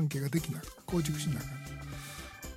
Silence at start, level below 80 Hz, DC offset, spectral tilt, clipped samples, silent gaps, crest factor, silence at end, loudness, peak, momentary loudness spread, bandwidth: 0 s; -52 dBFS; under 0.1%; -5.5 dB/octave; under 0.1%; none; 18 dB; 0 s; -36 LUFS; -18 dBFS; 11 LU; 16.5 kHz